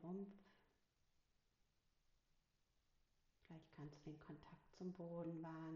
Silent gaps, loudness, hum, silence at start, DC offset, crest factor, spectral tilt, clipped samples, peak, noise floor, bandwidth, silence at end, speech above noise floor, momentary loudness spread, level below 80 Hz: none; -56 LUFS; none; 0 s; under 0.1%; 18 dB; -8 dB/octave; under 0.1%; -40 dBFS; -84 dBFS; 7 kHz; 0 s; 30 dB; 13 LU; -82 dBFS